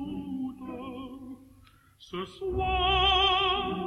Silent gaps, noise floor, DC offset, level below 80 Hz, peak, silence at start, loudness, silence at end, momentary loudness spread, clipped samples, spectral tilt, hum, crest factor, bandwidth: none; -58 dBFS; under 0.1%; -42 dBFS; -12 dBFS; 0 s; -26 LUFS; 0 s; 20 LU; under 0.1%; -5 dB/octave; none; 18 dB; 12.5 kHz